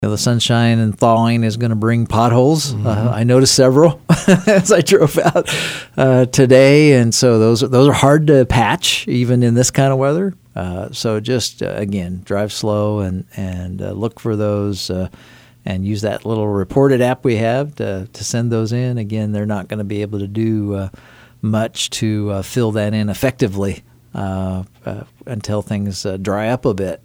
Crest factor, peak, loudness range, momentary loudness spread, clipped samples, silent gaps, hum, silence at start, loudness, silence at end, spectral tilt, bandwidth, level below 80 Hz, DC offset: 16 dB; 0 dBFS; 9 LU; 13 LU; under 0.1%; none; none; 0 s; -15 LUFS; 0.1 s; -5.5 dB/octave; 16.5 kHz; -44 dBFS; under 0.1%